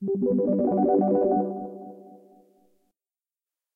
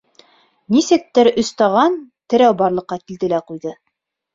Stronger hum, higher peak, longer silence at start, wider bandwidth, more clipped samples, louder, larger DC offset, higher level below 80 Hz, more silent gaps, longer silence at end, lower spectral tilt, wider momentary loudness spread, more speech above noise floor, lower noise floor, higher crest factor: neither; second, -12 dBFS vs -2 dBFS; second, 0 s vs 0.7 s; second, 2.3 kHz vs 7.6 kHz; neither; second, -23 LUFS vs -16 LUFS; neither; second, -66 dBFS vs -58 dBFS; neither; first, 1.6 s vs 0.6 s; first, -13 dB/octave vs -5 dB/octave; first, 18 LU vs 15 LU; first, over 68 dB vs 58 dB; first, under -90 dBFS vs -74 dBFS; about the same, 14 dB vs 16 dB